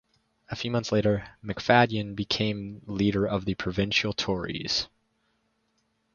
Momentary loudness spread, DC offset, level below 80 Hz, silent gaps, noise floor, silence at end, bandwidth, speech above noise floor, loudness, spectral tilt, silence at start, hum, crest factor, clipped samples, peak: 13 LU; under 0.1%; -52 dBFS; none; -73 dBFS; 1.3 s; 7.2 kHz; 46 dB; -27 LUFS; -5 dB/octave; 0.5 s; none; 24 dB; under 0.1%; -4 dBFS